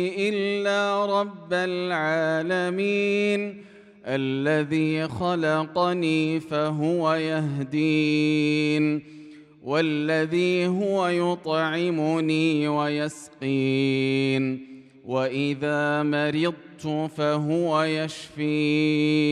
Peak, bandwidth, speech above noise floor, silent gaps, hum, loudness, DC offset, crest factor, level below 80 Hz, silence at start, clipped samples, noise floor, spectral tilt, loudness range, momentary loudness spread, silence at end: -10 dBFS; 11 kHz; 22 dB; none; none; -24 LUFS; under 0.1%; 14 dB; -68 dBFS; 0 s; under 0.1%; -46 dBFS; -6.5 dB/octave; 2 LU; 6 LU; 0 s